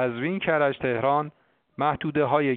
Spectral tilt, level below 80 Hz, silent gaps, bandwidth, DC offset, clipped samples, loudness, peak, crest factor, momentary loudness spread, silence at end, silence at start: -4.5 dB/octave; -58 dBFS; none; 4.5 kHz; under 0.1%; under 0.1%; -25 LUFS; -8 dBFS; 18 dB; 5 LU; 0 s; 0 s